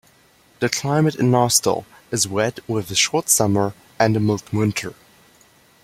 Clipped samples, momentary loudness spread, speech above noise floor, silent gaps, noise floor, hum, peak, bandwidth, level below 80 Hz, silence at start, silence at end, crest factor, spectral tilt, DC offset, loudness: under 0.1%; 10 LU; 35 dB; none; -55 dBFS; none; 0 dBFS; 16.5 kHz; -56 dBFS; 0.6 s; 0.9 s; 20 dB; -4 dB/octave; under 0.1%; -19 LUFS